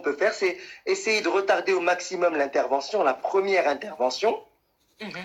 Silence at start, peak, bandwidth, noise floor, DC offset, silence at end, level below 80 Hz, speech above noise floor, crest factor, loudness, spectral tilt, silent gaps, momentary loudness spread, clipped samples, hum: 0 s; -10 dBFS; 12.5 kHz; -67 dBFS; under 0.1%; 0 s; -72 dBFS; 42 dB; 16 dB; -24 LUFS; -3 dB/octave; none; 6 LU; under 0.1%; none